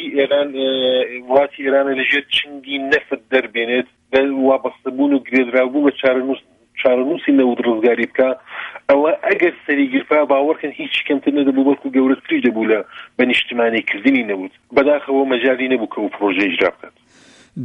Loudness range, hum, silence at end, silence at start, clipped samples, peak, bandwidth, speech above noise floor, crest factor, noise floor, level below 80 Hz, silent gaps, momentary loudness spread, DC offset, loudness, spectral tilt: 1 LU; none; 0 s; 0 s; under 0.1%; -2 dBFS; 6.2 kHz; 32 dB; 16 dB; -48 dBFS; -62 dBFS; none; 5 LU; under 0.1%; -17 LUFS; -6 dB/octave